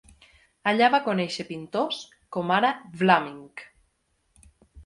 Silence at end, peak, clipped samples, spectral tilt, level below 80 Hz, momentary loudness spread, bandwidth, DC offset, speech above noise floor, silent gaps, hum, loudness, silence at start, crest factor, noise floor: 0 s; -4 dBFS; under 0.1%; -5 dB/octave; -62 dBFS; 16 LU; 11.5 kHz; under 0.1%; 47 dB; none; none; -24 LUFS; 0.65 s; 24 dB; -72 dBFS